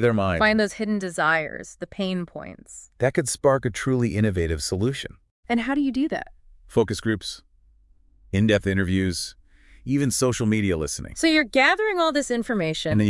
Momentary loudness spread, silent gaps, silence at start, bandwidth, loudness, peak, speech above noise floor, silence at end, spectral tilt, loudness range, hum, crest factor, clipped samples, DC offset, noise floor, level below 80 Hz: 14 LU; 5.31-5.43 s; 0 s; 12 kHz; -23 LUFS; -4 dBFS; 34 dB; 0 s; -5 dB/octave; 4 LU; none; 20 dB; under 0.1%; under 0.1%; -57 dBFS; -48 dBFS